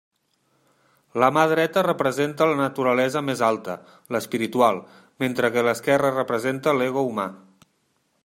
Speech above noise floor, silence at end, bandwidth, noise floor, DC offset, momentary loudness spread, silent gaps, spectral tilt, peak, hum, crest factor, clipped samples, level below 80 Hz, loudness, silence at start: 47 dB; 0.9 s; 16 kHz; -69 dBFS; under 0.1%; 10 LU; none; -5.5 dB/octave; -2 dBFS; none; 20 dB; under 0.1%; -68 dBFS; -22 LUFS; 1.15 s